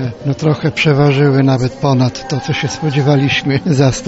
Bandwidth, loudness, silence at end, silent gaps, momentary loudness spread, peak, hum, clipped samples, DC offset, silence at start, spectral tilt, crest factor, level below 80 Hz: 8 kHz; -13 LUFS; 0 s; none; 7 LU; -2 dBFS; none; under 0.1%; under 0.1%; 0 s; -6 dB/octave; 12 dB; -42 dBFS